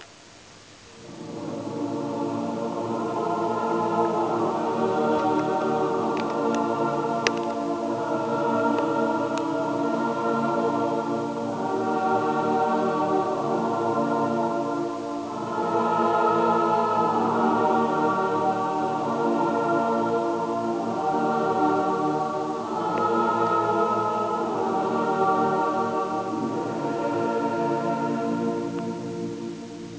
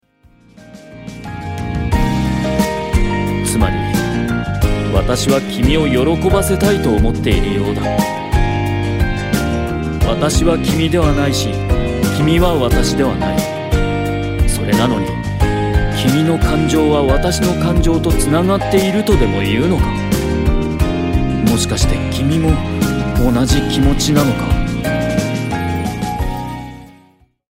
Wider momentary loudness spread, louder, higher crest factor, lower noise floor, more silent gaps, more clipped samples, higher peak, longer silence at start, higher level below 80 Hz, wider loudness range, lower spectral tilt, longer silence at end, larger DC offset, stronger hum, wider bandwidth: about the same, 7 LU vs 6 LU; second, -25 LUFS vs -15 LUFS; first, 24 dB vs 14 dB; about the same, -48 dBFS vs -51 dBFS; neither; neither; about the same, 0 dBFS vs 0 dBFS; second, 0 s vs 0.6 s; second, -66 dBFS vs -22 dBFS; about the same, 4 LU vs 3 LU; about the same, -6.5 dB/octave vs -5.5 dB/octave; second, 0 s vs 0.65 s; neither; neither; second, 8 kHz vs 16.5 kHz